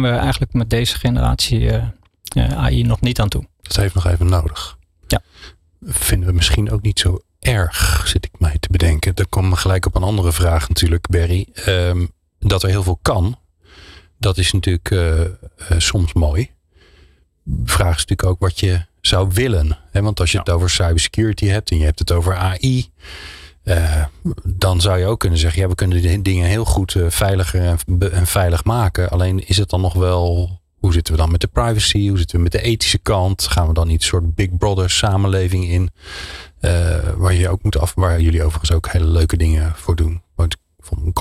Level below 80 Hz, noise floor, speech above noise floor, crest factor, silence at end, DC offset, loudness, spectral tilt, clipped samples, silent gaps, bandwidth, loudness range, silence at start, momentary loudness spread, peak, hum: -24 dBFS; -51 dBFS; 35 dB; 10 dB; 0 s; under 0.1%; -17 LUFS; -5 dB/octave; under 0.1%; none; 15 kHz; 3 LU; 0 s; 7 LU; -6 dBFS; none